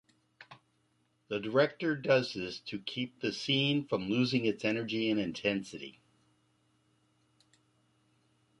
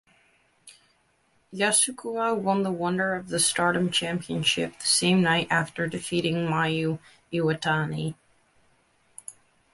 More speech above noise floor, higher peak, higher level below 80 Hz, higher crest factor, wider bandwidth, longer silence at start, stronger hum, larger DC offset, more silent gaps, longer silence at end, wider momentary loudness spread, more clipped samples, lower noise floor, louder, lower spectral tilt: about the same, 42 dB vs 41 dB; second, -12 dBFS vs -8 dBFS; second, -72 dBFS vs -62 dBFS; about the same, 22 dB vs 18 dB; about the same, 11.5 kHz vs 12 kHz; second, 0.4 s vs 0.65 s; neither; neither; neither; first, 2.7 s vs 0.4 s; about the same, 10 LU vs 12 LU; neither; first, -74 dBFS vs -67 dBFS; second, -32 LUFS vs -25 LUFS; first, -5.5 dB/octave vs -3.5 dB/octave